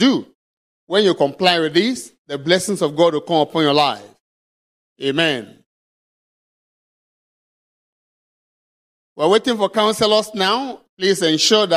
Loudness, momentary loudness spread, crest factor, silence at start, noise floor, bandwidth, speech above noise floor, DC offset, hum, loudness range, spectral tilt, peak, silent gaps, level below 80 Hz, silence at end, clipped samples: -17 LUFS; 10 LU; 20 dB; 0 s; under -90 dBFS; 15.5 kHz; over 73 dB; under 0.1%; none; 9 LU; -3.5 dB/octave; 0 dBFS; 0.35-0.87 s, 2.18-2.25 s, 4.20-4.96 s, 5.66-9.16 s, 10.89-10.97 s; -64 dBFS; 0 s; under 0.1%